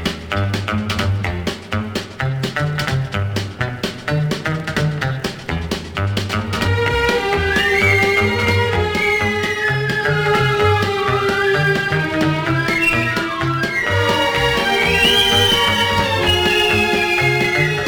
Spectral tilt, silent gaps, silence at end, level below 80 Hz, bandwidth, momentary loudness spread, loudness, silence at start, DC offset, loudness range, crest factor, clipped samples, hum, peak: -4.5 dB/octave; none; 0 s; -38 dBFS; over 20 kHz; 10 LU; -17 LUFS; 0 s; under 0.1%; 8 LU; 16 dB; under 0.1%; none; -2 dBFS